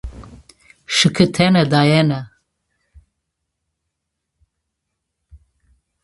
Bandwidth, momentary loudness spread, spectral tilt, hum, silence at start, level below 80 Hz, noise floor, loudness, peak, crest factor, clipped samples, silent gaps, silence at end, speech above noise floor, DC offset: 11.5 kHz; 9 LU; -5 dB/octave; none; 0.05 s; -46 dBFS; -77 dBFS; -15 LUFS; 0 dBFS; 20 dB; under 0.1%; none; 3.75 s; 63 dB; under 0.1%